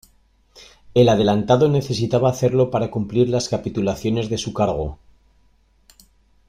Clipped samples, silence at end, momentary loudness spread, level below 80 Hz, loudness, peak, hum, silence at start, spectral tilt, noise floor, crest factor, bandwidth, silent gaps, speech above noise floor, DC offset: under 0.1%; 1.55 s; 7 LU; -46 dBFS; -19 LUFS; -2 dBFS; none; 0.55 s; -6.5 dB/octave; -58 dBFS; 18 dB; 15.5 kHz; none; 39 dB; under 0.1%